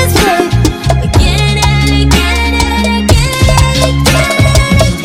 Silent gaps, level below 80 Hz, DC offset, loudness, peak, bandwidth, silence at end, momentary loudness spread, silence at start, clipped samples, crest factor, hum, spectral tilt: none; -14 dBFS; under 0.1%; -9 LUFS; 0 dBFS; 16.5 kHz; 0 s; 3 LU; 0 s; 2%; 8 dB; none; -4.5 dB/octave